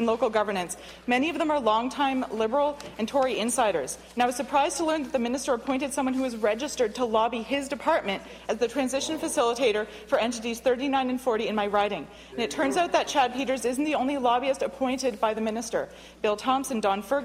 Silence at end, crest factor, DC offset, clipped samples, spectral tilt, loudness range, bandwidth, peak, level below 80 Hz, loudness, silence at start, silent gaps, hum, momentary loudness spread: 0 s; 16 dB; under 0.1%; under 0.1%; -3 dB/octave; 1 LU; 16 kHz; -10 dBFS; -58 dBFS; -27 LUFS; 0 s; none; none; 6 LU